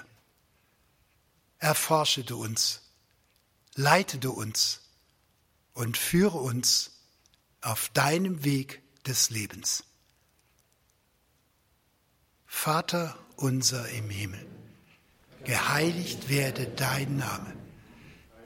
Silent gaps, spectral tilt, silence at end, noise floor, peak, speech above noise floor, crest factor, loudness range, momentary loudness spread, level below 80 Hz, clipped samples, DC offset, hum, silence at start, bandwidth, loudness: none; -3.5 dB/octave; 0 s; -69 dBFS; -6 dBFS; 41 dB; 24 dB; 5 LU; 14 LU; -62 dBFS; under 0.1%; under 0.1%; none; 0 s; 16.5 kHz; -28 LUFS